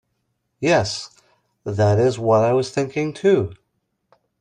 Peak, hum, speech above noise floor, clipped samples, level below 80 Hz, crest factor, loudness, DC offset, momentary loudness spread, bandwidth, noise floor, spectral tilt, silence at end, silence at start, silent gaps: -4 dBFS; none; 54 dB; under 0.1%; -56 dBFS; 16 dB; -20 LUFS; under 0.1%; 13 LU; 10.5 kHz; -73 dBFS; -6 dB/octave; 0.85 s; 0.6 s; none